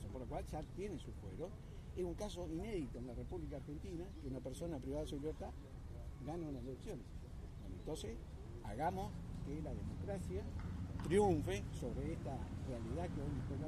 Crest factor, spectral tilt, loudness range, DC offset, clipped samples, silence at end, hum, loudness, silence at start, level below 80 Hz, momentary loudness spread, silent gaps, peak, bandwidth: 20 dB; -7 dB/octave; 7 LU; under 0.1%; under 0.1%; 0 s; none; -45 LUFS; 0 s; -52 dBFS; 10 LU; none; -24 dBFS; 14.5 kHz